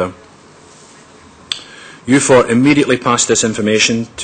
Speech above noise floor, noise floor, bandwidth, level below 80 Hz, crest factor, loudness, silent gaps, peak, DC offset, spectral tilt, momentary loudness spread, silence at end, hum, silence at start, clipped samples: 30 dB; -42 dBFS; 9.4 kHz; -48 dBFS; 14 dB; -13 LUFS; none; 0 dBFS; under 0.1%; -3.5 dB/octave; 14 LU; 0 s; none; 0 s; under 0.1%